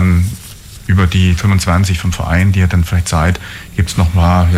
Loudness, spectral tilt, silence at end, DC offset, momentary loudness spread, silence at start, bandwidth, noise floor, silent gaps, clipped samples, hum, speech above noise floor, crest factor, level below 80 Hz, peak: -13 LUFS; -6 dB/octave; 0 s; under 0.1%; 10 LU; 0 s; 15 kHz; -32 dBFS; none; under 0.1%; none; 21 dB; 10 dB; -26 dBFS; -2 dBFS